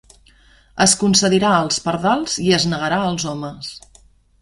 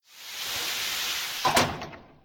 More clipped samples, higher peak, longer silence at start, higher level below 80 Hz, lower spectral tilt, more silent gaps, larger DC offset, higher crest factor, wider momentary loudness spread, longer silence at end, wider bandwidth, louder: neither; first, -2 dBFS vs -10 dBFS; first, 0.75 s vs 0.1 s; first, -48 dBFS vs -56 dBFS; first, -3.5 dB/octave vs -1.5 dB/octave; neither; neither; about the same, 18 dB vs 20 dB; about the same, 15 LU vs 15 LU; first, 0.65 s vs 0.2 s; second, 11.5 kHz vs 19.5 kHz; first, -17 LUFS vs -27 LUFS